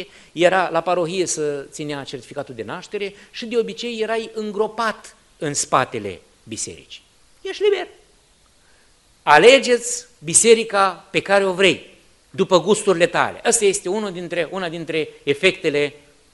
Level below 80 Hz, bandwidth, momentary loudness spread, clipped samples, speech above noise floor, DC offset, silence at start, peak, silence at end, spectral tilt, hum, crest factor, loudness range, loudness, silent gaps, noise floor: -58 dBFS; 11.5 kHz; 16 LU; under 0.1%; 36 dB; under 0.1%; 0 s; 0 dBFS; 0.4 s; -2.5 dB/octave; none; 20 dB; 10 LU; -19 LUFS; none; -56 dBFS